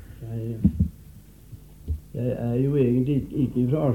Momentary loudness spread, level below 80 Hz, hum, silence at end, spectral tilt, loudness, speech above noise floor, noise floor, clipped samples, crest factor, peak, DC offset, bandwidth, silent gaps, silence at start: 13 LU; -38 dBFS; none; 0 s; -10 dB/octave; -25 LUFS; 24 dB; -47 dBFS; under 0.1%; 18 dB; -6 dBFS; under 0.1%; 16.5 kHz; none; 0 s